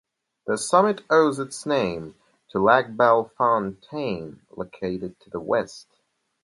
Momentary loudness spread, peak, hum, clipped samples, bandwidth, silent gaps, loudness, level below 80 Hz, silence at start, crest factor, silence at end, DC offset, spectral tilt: 17 LU; -2 dBFS; none; under 0.1%; 11.5 kHz; none; -23 LUFS; -60 dBFS; 0.45 s; 22 dB; 0.6 s; under 0.1%; -5 dB/octave